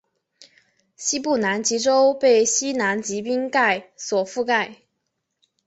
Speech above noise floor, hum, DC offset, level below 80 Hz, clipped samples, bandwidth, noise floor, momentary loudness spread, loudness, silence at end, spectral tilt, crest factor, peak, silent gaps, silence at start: 56 dB; none; under 0.1%; -68 dBFS; under 0.1%; 8.2 kHz; -77 dBFS; 9 LU; -21 LUFS; 0.9 s; -2 dB/octave; 16 dB; -6 dBFS; none; 1 s